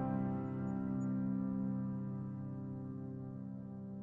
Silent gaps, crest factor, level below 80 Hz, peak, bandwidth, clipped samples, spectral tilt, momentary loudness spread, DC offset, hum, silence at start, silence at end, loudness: none; 12 dB; -66 dBFS; -28 dBFS; 7.2 kHz; under 0.1%; -11 dB/octave; 9 LU; under 0.1%; none; 0 s; 0 s; -41 LUFS